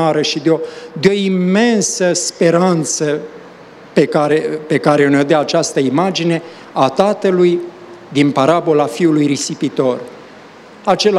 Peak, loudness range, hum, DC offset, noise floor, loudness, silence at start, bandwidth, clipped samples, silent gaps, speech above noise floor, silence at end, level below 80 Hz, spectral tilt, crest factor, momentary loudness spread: 0 dBFS; 1 LU; none; under 0.1%; -38 dBFS; -14 LUFS; 0 s; 13 kHz; under 0.1%; none; 24 dB; 0 s; -60 dBFS; -5 dB/octave; 14 dB; 9 LU